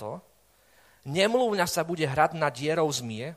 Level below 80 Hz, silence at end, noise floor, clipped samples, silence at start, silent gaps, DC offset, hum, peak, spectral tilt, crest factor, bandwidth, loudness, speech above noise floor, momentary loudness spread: -62 dBFS; 0 s; -62 dBFS; under 0.1%; 0 s; none; under 0.1%; none; -8 dBFS; -4 dB/octave; 20 dB; 15.5 kHz; -26 LUFS; 35 dB; 13 LU